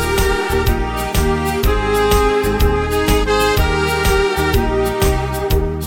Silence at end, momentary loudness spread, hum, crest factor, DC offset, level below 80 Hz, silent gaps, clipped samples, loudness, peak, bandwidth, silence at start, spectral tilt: 0 s; 4 LU; none; 14 dB; under 0.1%; -20 dBFS; none; under 0.1%; -16 LUFS; 0 dBFS; 17 kHz; 0 s; -5 dB/octave